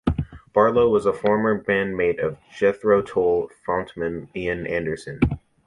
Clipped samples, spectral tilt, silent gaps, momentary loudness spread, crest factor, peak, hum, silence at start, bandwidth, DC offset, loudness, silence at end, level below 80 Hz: under 0.1%; -7.5 dB/octave; none; 10 LU; 18 dB; -4 dBFS; none; 0.05 s; 11 kHz; under 0.1%; -22 LUFS; 0.3 s; -40 dBFS